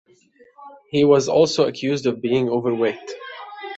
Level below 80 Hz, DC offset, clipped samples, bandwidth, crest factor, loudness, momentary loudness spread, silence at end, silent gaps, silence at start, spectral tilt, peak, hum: -62 dBFS; under 0.1%; under 0.1%; 8 kHz; 18 dB; -19 LUFS; 18 LU; 0 s; none; 0.6 s; -5.5 dB/octave; -2 dBFS; none